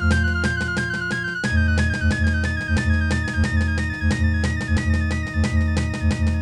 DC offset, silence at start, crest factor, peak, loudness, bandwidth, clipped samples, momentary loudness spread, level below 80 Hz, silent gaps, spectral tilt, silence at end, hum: under 0.1%; 0 s; 14 dB; -8 dBFS; -21 LUFS; 10.5 kHz; under 0.1%; 3 LU; -26 dBFS; none; -6 dB/octave; 0 s; none